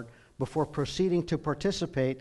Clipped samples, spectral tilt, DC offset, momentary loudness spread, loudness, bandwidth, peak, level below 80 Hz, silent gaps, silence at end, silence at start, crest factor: under 0.1%; -6 dB/octave; under 0.1%; 7 LU; -30 LUFS; 11.5 kHz; -16 dBFS; -52 dBFS; none; 0 s; 0 s; 16 dB